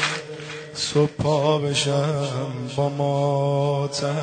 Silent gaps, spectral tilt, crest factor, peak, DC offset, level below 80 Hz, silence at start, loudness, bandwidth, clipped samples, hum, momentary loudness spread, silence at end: none; -5 dB/octave; 16 dB; -6 dBFS; under 0.1%; -56 dBFS; 0 s; -23 LUFS; 9.4 kHz; under 0.1%; none; 8 LU; 0 s